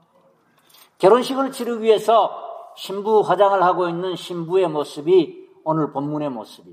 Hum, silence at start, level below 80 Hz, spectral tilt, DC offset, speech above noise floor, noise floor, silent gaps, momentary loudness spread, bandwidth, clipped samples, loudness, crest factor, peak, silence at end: none; 1 s; -76 dBFS; -6 dB/octave; under 0.1%; 39 dB; -58 dBFS; none; 14 LU; 15.5 kHz; under 0.1%; -19 LUFS; 18 dB; -2 dBFS; 0 s